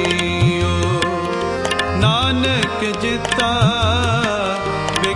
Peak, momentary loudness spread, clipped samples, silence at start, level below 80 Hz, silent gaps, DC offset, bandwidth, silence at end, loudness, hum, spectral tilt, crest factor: -2 dBFS; 5 LU; under 0.1%; 0 s; -38 dBFS; none; under 0.1%; 11.5 kHz; 0 s; -17 LUFS; none; -5 dB/octave; 16 dB